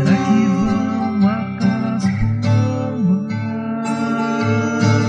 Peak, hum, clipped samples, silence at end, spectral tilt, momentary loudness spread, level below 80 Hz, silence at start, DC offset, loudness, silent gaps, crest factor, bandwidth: -2 dBFS; none; under 0.1%; 0 s; -7.5 dB/octave; 6 LU; -38 dBFS; 0 s; under 0.1%; -18 LUFS; none; 14 dB; 9.4 kHz